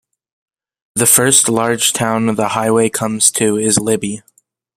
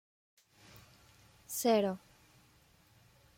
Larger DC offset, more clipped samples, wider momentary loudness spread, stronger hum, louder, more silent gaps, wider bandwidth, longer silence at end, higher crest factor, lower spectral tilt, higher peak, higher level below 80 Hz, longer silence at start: neither; neither; second, 9 LU vs 28 LU; neither; first, -13 LUFS vs -33 LUFS; neither; first, over 20 kHz vs 16.5 kHz; second, 0.55 s vs 1.4 s; second, 16 dB vs 22 dB; about the same, -3 dB/octave vs -4 dB/octave; first, 0 dBFS vs -18 dBFS; first, -56 dBFS vs -74 dBFS; second, 0.95 s vs 1.5 s